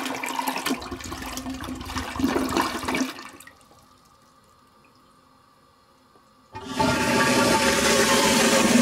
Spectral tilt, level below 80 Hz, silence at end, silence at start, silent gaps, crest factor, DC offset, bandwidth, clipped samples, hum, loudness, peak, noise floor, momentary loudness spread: -3 dB/octave; -48 dBFS; 0 s; 0 s; none; 18 dB; under 0.1%; 16 kHz; under 0.1%; none; -22 LUFS; -6 dBFS; -57 dBFS; 16 LU